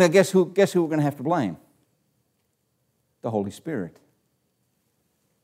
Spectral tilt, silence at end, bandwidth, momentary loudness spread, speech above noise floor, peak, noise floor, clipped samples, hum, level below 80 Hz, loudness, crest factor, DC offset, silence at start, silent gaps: -6 dB/octave; 1.55 s; 16 kHz; 15 LU; 50 dB; -4 dBFS; -72 dBFS; under 0.1%; none; -72 dBFS; -23 LUFS; 20 dB; under 0.1%; 0 s; none